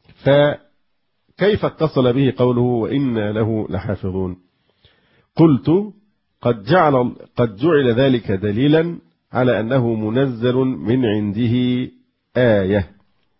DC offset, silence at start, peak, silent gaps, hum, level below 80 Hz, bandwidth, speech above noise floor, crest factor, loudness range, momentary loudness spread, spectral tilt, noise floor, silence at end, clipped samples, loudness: under 0.1%; 0.25 s; -2 dBFS; none; none; -44 dBFS; 5.8 kHz; 55 dB; 16 dB; 3 LU; 10 LU; -12.5 dB/octave; -71 dBFS; 0.55 s; under 0.1%; -18 LUFS